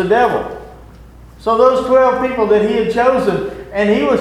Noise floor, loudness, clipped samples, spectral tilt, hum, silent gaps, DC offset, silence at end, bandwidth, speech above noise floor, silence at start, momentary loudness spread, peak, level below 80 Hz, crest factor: -38 dBFS; -14 LUFS; under 0.1%; -6.5 dB/octave; none; none; under 0.1%; 0 s; 12 kHz; 25 dB; 0 s; 11 LU; 0 dBFS; -40 dBFS; 14 dB